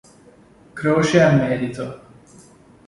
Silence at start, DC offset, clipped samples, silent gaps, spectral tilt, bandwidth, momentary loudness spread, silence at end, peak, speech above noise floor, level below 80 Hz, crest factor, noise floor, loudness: 0.75 s; under 0.1%; under 0.1%; none; -6.5 dB/octave; 11.5 kHz; 17 LU; 0.9 s; -2 dBFS; 32 dB; -52 dBFS; 20 dB; -49 dBFS; -18 LUFS